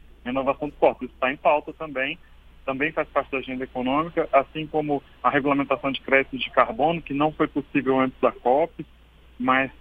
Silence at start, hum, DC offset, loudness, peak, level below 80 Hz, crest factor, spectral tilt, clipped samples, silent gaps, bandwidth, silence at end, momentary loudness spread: 0.25 s; none; under 0.1%; -24 LUFS; -2 dBFS; -50 dBFS; 22 dB; -8 dB/octave; under 0.1%; none; 4.8 kHz; 0.1 s; 8 LU